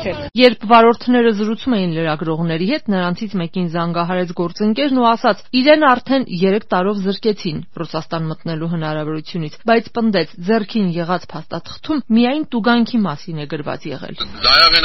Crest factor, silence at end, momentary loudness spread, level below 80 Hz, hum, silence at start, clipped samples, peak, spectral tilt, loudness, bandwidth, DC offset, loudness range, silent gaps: 16 dB; 0 s; 14 LU; -44 dBFS; none; 0 s; under 0.1%; 0 dBFS; -3.5 dB/octave; -16 LUFS; 6.2 kHz; 2%; 5 LU; none